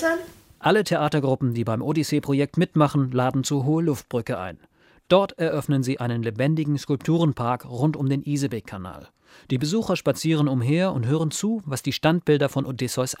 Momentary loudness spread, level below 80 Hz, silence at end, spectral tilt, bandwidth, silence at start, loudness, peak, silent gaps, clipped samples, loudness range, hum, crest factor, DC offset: 7 LU; -58 dBFS; 0.05 s; -6 dB/octave; 16 kHz; 0 s; -23 LUFS; -4 dBFS; none; under 0.1%; 3 LU; none; 18 dB; under 0.1%